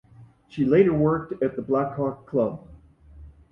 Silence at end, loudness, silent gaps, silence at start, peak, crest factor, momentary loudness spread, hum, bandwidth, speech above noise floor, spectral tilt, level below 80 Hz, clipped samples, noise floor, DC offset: 0.25 s; -24 LUFS; none; 0.2 s; -6 dBFS; 18 dB; 10 LU; none; 5.8 kHz; 26 dB; -10.5 dB/octave; -52 dBFS; under 0.1%; -48 dBFS; under 0.1%